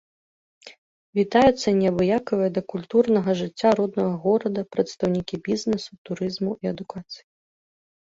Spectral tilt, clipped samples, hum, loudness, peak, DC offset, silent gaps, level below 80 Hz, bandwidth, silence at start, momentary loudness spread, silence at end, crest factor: -6.5 dB/octave; under 0.1%; none; -23 LUFS; -4 dBFS; under 0.1%; 0.78-1.13 s, 5.98-6.05 s; -56 dBFS; 7.8 kHz; 0.65 s; 11 LU; 1 s; 20 dB